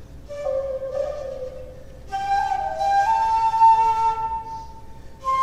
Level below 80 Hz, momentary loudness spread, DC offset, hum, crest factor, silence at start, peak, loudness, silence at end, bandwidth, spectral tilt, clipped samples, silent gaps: -44 dBFS; 20 LU; under 0.1%; none; 16 dB; 0 s; -6 dBFS; -21 LUFS; 0 s; 11.5 kHz; -4 dB/octave; under 0.1%; none